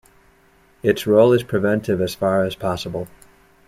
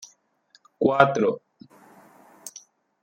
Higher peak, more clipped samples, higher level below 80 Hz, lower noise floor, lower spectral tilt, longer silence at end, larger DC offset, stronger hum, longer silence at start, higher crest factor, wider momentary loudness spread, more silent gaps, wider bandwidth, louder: about the same, -2 dBFS vs -2 dBFS; neither; first, -52 dBFS vs -70 dBFS; second, -55 dBFS vs -62 dBFS; about the same, -6.5 dB/octave vs -5.5 dB/octave; about the same, 0.6 s vs 0.55 s; neither; neither; first, 0.85 s vs 0 s; second, 18 dB vs 24 dB; second, 13 LU vs 22 LU; neither; about the same, 16 kHz vs 16.5 kHz; about the same, -19 LUFS vs -21 LUFS